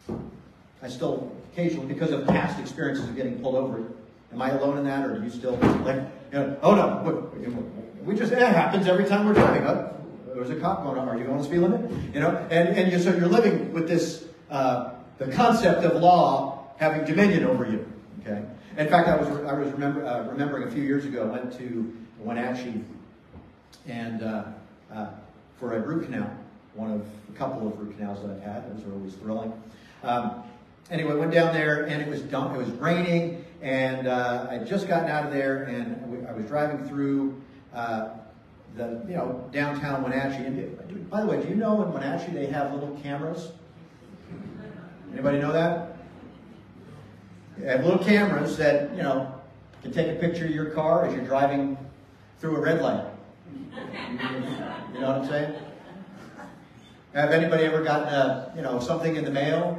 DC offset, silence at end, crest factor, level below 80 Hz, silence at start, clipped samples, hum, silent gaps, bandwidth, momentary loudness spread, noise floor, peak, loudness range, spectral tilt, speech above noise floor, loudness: under 0.1%; 0 s; 22 dB; -58 dBFS; 0.05 s; under 0.1%; none; none; 13 kHz; 18 LU; -51 dBFS; -4 dBFS; 11 LU; -7 dB/octave; 26 dB; -26 LUFS